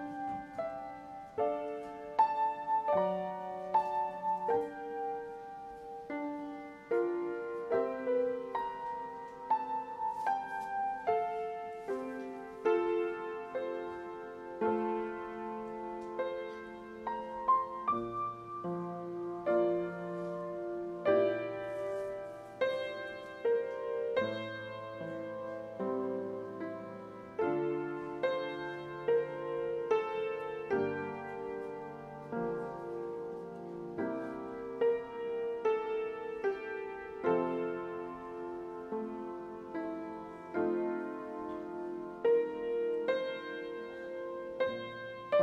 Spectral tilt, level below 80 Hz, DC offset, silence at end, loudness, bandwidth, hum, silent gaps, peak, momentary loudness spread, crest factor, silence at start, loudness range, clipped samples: -7 dB/octave; -70 dBFS; under 0.1%; 0 s; -36 LUFS; 9.4 kHz; none; none; -16 dBFS; 11 LU; 20 dB; 0 s; 4 LU; under 0.1%